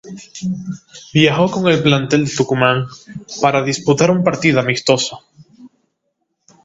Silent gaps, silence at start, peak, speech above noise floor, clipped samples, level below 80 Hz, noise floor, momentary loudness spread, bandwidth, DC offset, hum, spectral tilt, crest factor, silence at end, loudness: none; 0.05 s; 0 dBFS; 55 dB; under 0.1%; -52 dBFS; -71 dBFS; 15 LU; 8 kHz; under 0.1%; none; -5 dB/octave; 16 dB; 0.95 s; -15 LUFS